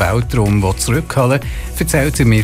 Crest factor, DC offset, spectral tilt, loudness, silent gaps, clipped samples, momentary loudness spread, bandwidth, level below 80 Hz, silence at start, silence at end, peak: 12 dB; under 0.1%; -5.5 dB/octave; -15 LUFS; none; under 0.1%; 5 LU; 16 kHz; -26 dBFS; 0 s; 0 s; -2 dBFS